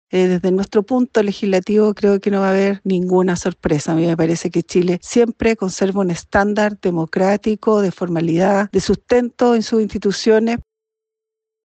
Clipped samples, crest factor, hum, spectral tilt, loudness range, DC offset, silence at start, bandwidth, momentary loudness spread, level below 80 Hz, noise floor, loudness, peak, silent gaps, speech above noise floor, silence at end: under 0.1%; 14 dB; none; -6 dB/octave; 1 LU; under 0.1%; 0.15 s; 8.8 kHz; 5 LU; -44 dBFS; -83 dBFS; -17 LUFS; -4 dBFS; none; 67 dB; 1.05 s